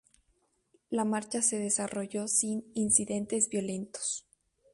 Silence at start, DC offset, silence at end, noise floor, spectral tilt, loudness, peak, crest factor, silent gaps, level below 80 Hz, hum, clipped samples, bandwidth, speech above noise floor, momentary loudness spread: 0.9 s; under 0.1%; 0.55 s; -74 dBFS; -3.5 dB/octave; -30 LUFS; -12 dBFS; 22 dB; none; -68 dBFS; none; under 0.1%; 11.5 kHz; 42 dB; 9 LU